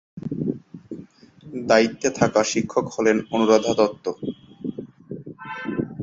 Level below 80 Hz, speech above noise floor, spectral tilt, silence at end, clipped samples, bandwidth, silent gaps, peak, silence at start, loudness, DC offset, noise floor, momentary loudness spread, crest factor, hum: -58 dBFS; 26 dB; -4.5 dB/octave; 0 s; under 0.1%; 7.8 kHz; none; -2 dBFS; 0.15 s; -22 LUFS; under 0.1%; -46 dBFS; 20 LU; 22 dB; none